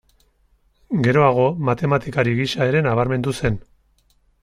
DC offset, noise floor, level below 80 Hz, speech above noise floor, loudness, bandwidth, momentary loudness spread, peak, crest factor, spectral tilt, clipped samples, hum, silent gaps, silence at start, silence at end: under 0.1%; -60 dBFS; -46 dBFS; 42 dB; -19 LUFS; 12 kHz; 8 LU; -2 dBFS; 18 dB; -7 dB/octave; under 0.1%; none; none; 0.9 s; 0.85 s